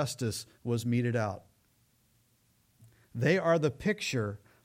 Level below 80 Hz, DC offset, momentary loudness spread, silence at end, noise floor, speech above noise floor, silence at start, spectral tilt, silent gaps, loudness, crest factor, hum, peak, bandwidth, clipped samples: -64 dBFS; under 0.1%; 12 LU; 0.3 s; -69 dBFS; 39 dB; 0 s; -5.5 dB/octave; none; -31 LUFS; 18 dB; none; -14 dBFS; 16 kHz; under 0.1%